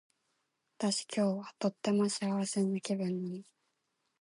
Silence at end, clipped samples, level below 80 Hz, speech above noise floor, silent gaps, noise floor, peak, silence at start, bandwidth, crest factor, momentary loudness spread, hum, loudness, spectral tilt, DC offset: 0.8 s; under 0.1%; -84 dBFS; 48 dB; none; -82 dBFS; -16 dBFS; 0.8 s; 11.5 kHz; 18 dB; 6 LU; none; -34 LUFS; -5 dB/octave; under 0.1%